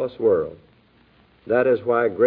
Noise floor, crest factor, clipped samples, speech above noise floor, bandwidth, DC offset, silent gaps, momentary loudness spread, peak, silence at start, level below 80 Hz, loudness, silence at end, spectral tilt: -56 dBFS; 16 dB; under 0.1%; 37 dB; 4.5 kHz; under 0.1%; none; 4 LU; -6 dBFS; 0 s; -60 dBFS; -21 LUFS; 0 s; -10.5 dB/octave